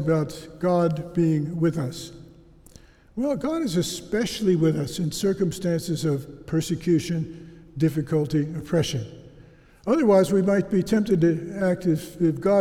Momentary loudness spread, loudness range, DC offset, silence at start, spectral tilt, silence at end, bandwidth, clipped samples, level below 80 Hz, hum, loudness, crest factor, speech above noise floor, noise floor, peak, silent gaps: 10 LU; 4 LU; under 0.1%; 0 s; -6.5 dB/octave; 0 s; 16 kHz; under 0.1%; -52 dBFS; none; -24 LUFS; 16 dB; 27 dB; -50 dBFS; -8 dBFS; none